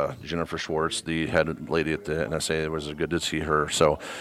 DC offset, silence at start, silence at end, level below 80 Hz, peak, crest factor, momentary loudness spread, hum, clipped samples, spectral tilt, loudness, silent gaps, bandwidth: under 0.1%; 0 s; 0 s; -46 dBFS; -6 dBFS; 20 dB; 7 LU; none; under 0.1%; -4 dB/octave; -26 LUFS; none; 15.5 kHz